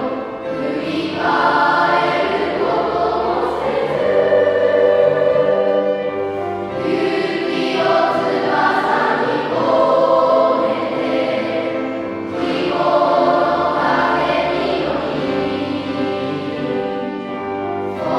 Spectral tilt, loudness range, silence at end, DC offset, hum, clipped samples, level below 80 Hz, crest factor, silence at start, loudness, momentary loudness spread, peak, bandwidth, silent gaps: -6 dB/octave; 3 LU; 0 s; under 0.1%; none; under 0.1%; -50 dBFS; 16 dB; 0 s; -17 LUFS; 9 LU; -2 dBFS; 11 kHz; none